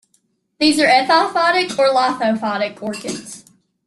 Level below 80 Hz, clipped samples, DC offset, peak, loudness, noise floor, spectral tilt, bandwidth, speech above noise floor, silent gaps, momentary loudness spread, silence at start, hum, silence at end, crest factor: -62 dBFS; under 0.1%; under 0.1%; -2 dBFS; -16 LUFS; -64 dBFS; -3 dB/octave; 12.5 kHz; 48 dB; none; 14 LU; 0.6 s; none; 0.45 s; 16 dB